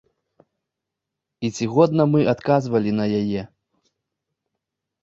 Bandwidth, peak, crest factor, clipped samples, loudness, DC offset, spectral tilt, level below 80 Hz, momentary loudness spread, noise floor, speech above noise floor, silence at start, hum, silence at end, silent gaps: 8 kHz; -2 dBFS; 20 dB; under 0.1%; -20 LUFS; under 0.1%; -7.5 dB/octave; -58 dBFS; 12 LU; -83 dBFS; 64 dB; 1.4 s; none; 1.55 s; none